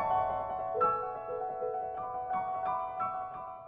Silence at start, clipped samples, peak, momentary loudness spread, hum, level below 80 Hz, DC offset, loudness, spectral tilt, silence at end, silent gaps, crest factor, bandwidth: 0 s; under 0.1%; -18 dBFS; 7 LU; none; -64 dBFS; under 0.1%; -34 LUFS; -4.5 dB/octave; 0 s; none; 16 dB; 4.4 kHz